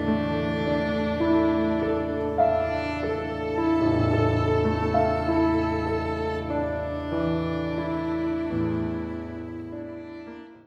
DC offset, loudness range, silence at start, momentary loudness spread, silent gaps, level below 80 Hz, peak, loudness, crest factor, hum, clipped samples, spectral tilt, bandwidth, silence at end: under 0.1%; 5 LU; 0 s; 13 LU; none; -42 dBFS; -10 dBFS; -25 LUFS; 16 dB; none; under 0.1%; -8.5 dB/octave; 7.4 kHz; 0.05 s